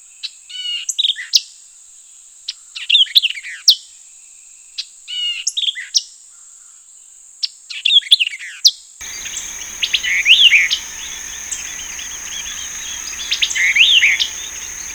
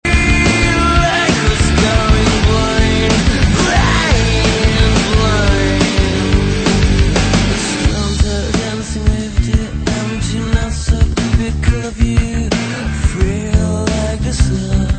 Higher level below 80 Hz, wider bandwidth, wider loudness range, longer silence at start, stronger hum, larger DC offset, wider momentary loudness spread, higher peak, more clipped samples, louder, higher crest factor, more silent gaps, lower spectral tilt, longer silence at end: second, -52 dBFS vs -18 dBFS; first, over 20 kHz vs 9.2 kHz; first, 8 LU vs 4 LU; first, 0.25 s vs 0.05 s; neither; neither; first, 20 LU vs 6 LU; about the same, 0 dBFS vs 0 dBFS; neither; about the same, -14 LUFS vs -14 LUFS; first, 18 dB vs 12 dB; neither; second, 4 dB/octave vs -5 dB/octave; about the same, 0 s vs 0 s